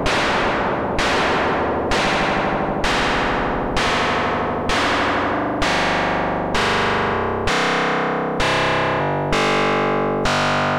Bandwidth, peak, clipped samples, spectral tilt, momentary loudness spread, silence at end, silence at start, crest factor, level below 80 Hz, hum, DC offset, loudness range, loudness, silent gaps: 16.5 kHz; -6 dBFS; under 0.1%; -4.5 dB/octave; 3 LU; 0 s; 0 s; 14 dB; -36 dBFS; none; under 0.1%; 1 LU; -19 LUFS; none